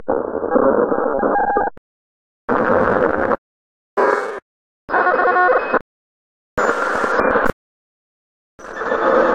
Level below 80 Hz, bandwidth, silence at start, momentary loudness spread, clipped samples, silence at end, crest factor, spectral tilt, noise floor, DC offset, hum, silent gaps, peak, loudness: -44 dBFS; 10 kHz; 0 s; 10 LU; under 0.1%; 0 s; 18 dB; -6 dB/octave; under -90 dBFS; under 0.1%; none; 1.78-2.48 s, 3.38-3.97 s, 4.42-4.88 s, 5.81-6.57 s, 7.53-8.58 s; 0 dBFS; -17 LUFS